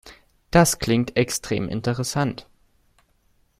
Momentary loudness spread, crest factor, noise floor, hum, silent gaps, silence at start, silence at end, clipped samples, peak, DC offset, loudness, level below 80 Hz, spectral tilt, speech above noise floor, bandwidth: 8 LU; 22 dB; -63 dBFS; none; none; 0.05 s; 1.2 s; under 0.1%; -2 dBFS; under 0.1%; -22 LUFS; -46 dBFS; -4.5 dB/octave; 42 dB; 16 kHz